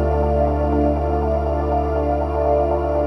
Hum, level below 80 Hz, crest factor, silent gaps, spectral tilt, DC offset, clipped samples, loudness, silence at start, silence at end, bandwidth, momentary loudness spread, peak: none; -24 dBFS; 12 dB; none; -10 dB/octave; under 0.1%; under 0.1%; -20 LUFS; 0 s; 0 s; 6 kHz; 2 LU; -6 dBFS